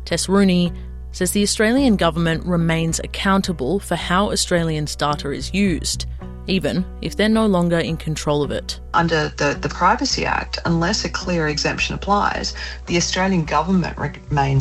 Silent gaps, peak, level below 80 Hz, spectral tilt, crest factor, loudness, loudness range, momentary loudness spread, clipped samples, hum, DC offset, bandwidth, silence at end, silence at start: none; -4 dBFS; -34 dBFS; -4.5 dB/octave; 16 dB; -19 LUFS; 2 LU; 8 LU; under 0.1%; none; under 0.1%; 13.5 kHz; 0 s; 0 s